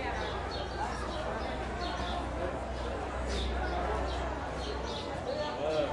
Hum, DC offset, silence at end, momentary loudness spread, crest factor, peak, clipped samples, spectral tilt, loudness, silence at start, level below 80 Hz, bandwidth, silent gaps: none; under 0.1%; 0 s; 3 LU; 14 dB; -20 dBFS; under 0.1%; -5.5 dB/octave; -35 LUFS; 0 s; -40 dBFS; 11.5 kHz; none